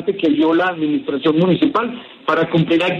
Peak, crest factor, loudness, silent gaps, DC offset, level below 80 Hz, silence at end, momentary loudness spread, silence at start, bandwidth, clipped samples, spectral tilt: -2 dBFS; 14 dB; -17 LUFS; none; under 0.1%; -58 dBFS; 0 s; 6 LU; 0 s; 6.6 kHz; under 0.1%; -8 dB/octave